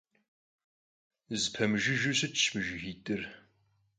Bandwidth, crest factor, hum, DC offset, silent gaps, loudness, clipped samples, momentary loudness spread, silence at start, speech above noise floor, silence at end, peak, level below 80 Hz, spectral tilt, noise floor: 9.6 kHz; 20 dB; none; under 0.1%; none; -31 LUFS; under 0.1%; 11 LU; 1.3 s; 40 dB; 0.6 s; -14 dBFS; -64 dBFS; -3 dB/octave; -72 dBFS